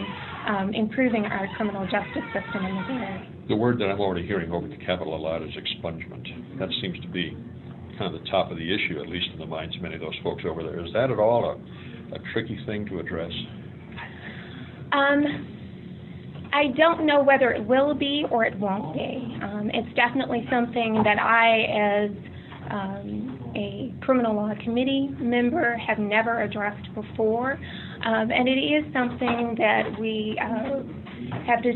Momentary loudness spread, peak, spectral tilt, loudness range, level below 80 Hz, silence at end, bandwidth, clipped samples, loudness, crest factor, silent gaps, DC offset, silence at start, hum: 16 LU; -6 dBFS; -8.5 dB/octave; 7 LU; -56 dBFS; 0 s; 4.3 kHz; under 0.1%; -25 LUFS; 20 dB; none; under 0.1%; 0 s; none